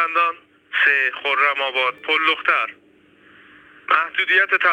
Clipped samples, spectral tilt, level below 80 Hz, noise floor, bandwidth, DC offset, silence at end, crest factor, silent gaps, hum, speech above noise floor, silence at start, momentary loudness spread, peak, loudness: under 0.1%; -1.5 dB/octave; -76 dBFS; -52 dBFS; 16.5 kHz; under 0.1%; 0 s; 16 dB; none; none; 33 dB; 0 s; 9 LU; -4 dBFS; -18 LUFS